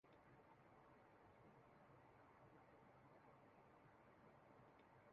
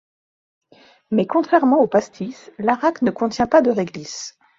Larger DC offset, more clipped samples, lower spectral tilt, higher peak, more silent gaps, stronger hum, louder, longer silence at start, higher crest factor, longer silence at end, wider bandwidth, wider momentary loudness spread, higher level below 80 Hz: neither; neither; about the same, -5.5 dB/octave vs -5.5 dB/octave; second, -56 dBFS vs -2 dBFS; neither; neither; second, -70 LUFS vs -18 LUFS; second, 0.05 s vs 1.1 s; about the same, 14 dB vs 18 dB; second, 0 s vs 0.3 s; second, 4.8 kHz vs 7.8 kHz; second, 0 LU vs 15 LU; second, -88 dBFS vs -56 dBFS